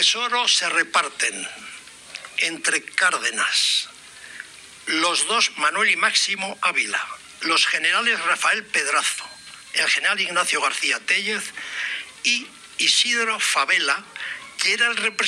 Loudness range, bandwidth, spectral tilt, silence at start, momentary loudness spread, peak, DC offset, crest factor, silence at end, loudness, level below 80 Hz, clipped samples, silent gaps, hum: 2 LU; 15.5 kHz; 1 dB/octave; 0 s; 16 LU; -6 dBFS; under 0.1%; 18 dB; 0 s; -20 LUFS; -72 dBFS; under 0.1%; none; none